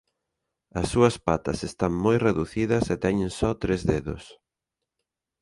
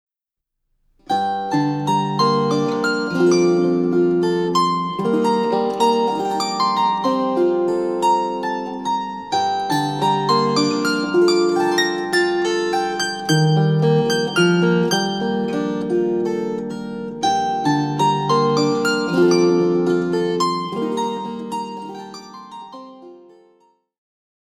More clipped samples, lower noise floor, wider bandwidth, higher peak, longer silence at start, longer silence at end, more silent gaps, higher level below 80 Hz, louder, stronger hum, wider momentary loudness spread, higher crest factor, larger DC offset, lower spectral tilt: neither; about the same, -86 dBFS vs -83 dBFS; second, 11.5 kHz vs 14.5 kHz; about the same, -6 dBFS vs -4 dBFS; second, 0.75 s vs 1.1 s; second, 1.1 s vs 1.4 s; neither; first, -44 dBFS vs -58 dBFS; second, -25 LUFS vs -19 LUFS; neither; about the same, 9 LU vs 9 LU; about the same, 20 dB vs 16 dB; neither; about the same, -6.5 dB/octave vs -5.5 dB/octave